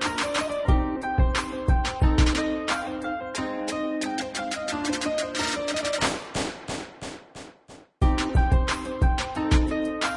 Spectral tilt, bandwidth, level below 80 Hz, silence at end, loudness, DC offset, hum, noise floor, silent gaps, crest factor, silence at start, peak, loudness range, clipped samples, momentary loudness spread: -5 dB/octave; 11.5 kHz; -28 dBFS; 0 s; -26 LUFS; under 0.1%; none; -50 dBFS; none; 18 dB; 0 s; -8 dBFS; 3 LU; under 0.1%; 10 LU